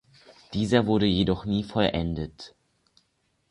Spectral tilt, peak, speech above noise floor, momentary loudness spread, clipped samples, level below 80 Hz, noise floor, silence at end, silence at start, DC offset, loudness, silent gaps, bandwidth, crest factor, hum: -6.5 dB/octave; -4 dBFS; 47 dB; 15 LU; under 0.1%; -46 dBFS; -72 dBFS; 1 s; 0.5 s; under 0.1%; -25 LUFS; none; 11 kHz; 22 dB; none